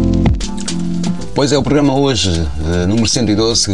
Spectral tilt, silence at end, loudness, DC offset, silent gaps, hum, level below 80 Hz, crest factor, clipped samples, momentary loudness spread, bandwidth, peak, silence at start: -5 dB/octave; 0 s; -15 LUFS; 5%; none; none; -26 dBFS; 14 dB; under 0.1%; 7 LU; 11.5 kHz; 0 dBFS; 0 s